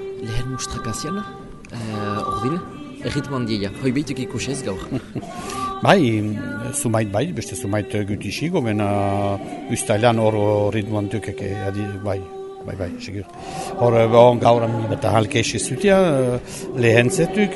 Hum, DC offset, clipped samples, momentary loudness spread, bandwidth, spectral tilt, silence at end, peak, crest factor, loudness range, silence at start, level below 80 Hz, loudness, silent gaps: none; under 0.1%; under 0.1%; 14 LU; 12 kHz; -5.5 dB/octave; 0 s; 0 dBFS; 20 dB; 8 LU; 0 s; -44 dBFS; -20 LUFS; none